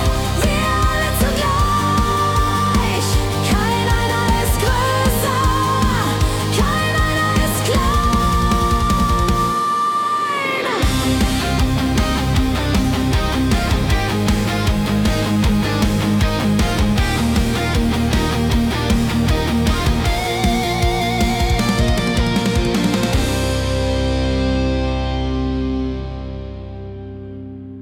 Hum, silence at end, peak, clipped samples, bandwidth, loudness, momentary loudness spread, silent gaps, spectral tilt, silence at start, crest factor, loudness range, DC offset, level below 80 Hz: none; 0 s; -6 dBFS; under 0.1%; 17.5 kHz; -17 LUFS; 3 LU; none; -5 dB/octave; 0 s; 12 dB; 2 LU; under 0.1%; -24 dBFS